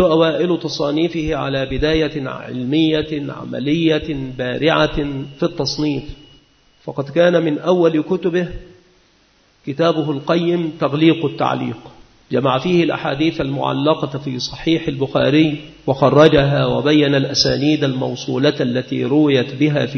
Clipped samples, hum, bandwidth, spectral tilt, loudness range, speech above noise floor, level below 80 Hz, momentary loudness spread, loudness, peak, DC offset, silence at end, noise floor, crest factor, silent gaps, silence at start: under 0.1%; none; 6.6 kHz; -6 dB/octave; 5 LU; 39 dB; -40 dBFS; 11 LU; -17 LUFS; 0 dBFS; under 0.1%; 0 s; -55 dBFS; 18 dB; none; 0 s